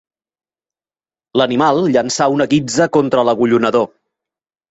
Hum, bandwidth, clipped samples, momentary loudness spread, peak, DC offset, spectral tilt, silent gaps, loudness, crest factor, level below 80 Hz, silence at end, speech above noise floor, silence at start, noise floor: none; 8.2 kHz; under 0.1%; 4 LU; -2 dBFS; under 0.1%; -5 dB/octave; none; -14 LUFS; 14 dB; -58 dBFS; 0.85 s; over 76 dB; 1.35 s; under -90 dBFS